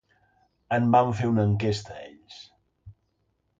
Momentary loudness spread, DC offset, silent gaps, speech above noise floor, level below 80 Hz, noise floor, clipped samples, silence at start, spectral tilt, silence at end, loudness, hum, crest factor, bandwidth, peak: 24 LU; under 0.1%; none; 50 dB; -54 dBFS; -73 dBFS; under 0.1%; 0.7 s; -7.5 dB/octave; 0.7 s; -24 LUFS; none; 20 dB; 7.8 kHz; -8 dBFS